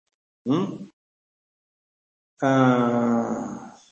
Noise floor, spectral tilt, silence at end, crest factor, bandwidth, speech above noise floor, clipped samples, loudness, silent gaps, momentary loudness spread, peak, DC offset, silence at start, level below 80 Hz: under -90 dBFS; -7.5 dB/octave; 0.2 s; 20 dB; 7.4 kHz; over 69 dB; under 0.1%; -23 LUFS; 0.93-2.37 s; 17 LU; -6 dBFS; under 0.1%; 0.45 s; -70 dBFS